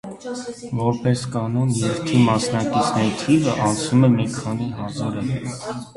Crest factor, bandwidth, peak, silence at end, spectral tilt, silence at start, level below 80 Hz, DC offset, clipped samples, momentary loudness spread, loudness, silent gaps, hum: 18 dB; 11.5 kHz; -4 dBFS; 0.05 s; -6 dB/octave; 0.05 s; -50 dBFS; under 0.1%; under 0.1%; 12 LU; -21 LUFS; none; none